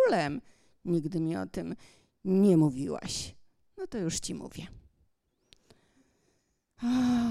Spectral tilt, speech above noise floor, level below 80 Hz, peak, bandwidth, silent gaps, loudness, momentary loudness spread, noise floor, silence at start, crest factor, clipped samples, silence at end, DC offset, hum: -6 dB/octave; 45 dB; -58 dBFS; -14 dBFS; 14 kHz; none; -30 LUFS; 19 LU; -74 dBFS; 0 s; 18 dB; under 0.1%; 0 s; under 0.1%; none